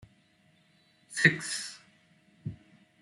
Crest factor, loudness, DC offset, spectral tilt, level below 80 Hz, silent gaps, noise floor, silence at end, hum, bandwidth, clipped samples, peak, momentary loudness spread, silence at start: 28 dB; -28 LUFS; under 0.1%; -3.5 dB/octave; -68 dBFS; none; -66 dBFS; 0.45 s; none; 12 kHz; under 0.1%; -6 dBFS; 20 LU; 1.1 s